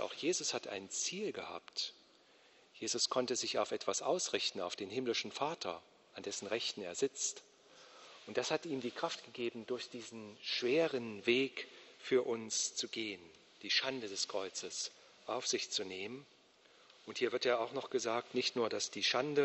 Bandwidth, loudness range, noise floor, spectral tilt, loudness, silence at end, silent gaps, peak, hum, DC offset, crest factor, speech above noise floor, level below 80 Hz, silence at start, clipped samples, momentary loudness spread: 8.2 kHz; 4 LU; -66 dBFS; -2 dB/octave; -37 LUFS; 0 s; none; -18 dBFS; none; under 0.1%; 20 dB; 28 dB; -84 dBFS; 0 s; under 0.1%; 13 LU